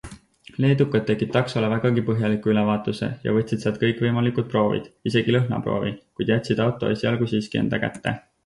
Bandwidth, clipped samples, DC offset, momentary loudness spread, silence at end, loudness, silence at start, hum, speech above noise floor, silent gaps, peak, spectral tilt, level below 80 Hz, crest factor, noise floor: 11.5 kHz; under 0.1%; under 0.1%; 7 LU; 0.25 s; -23 LUFS; 0.05 s; none; 23 dB; none; -6 dBFS; -7.5 dB/octave; -52 dBFS; 16 dB; -46 dBFS